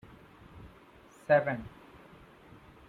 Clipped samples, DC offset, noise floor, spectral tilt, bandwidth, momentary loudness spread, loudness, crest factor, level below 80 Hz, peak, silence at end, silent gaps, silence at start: under 0.1%; under 0.1%; -57 dBFS; -7.5 dB/octave; 10 kHz; 28 LU; -29 LUFS; 24 dB; -62 dBFS; -12 dBFS; 1.2 s; none; 0.55 s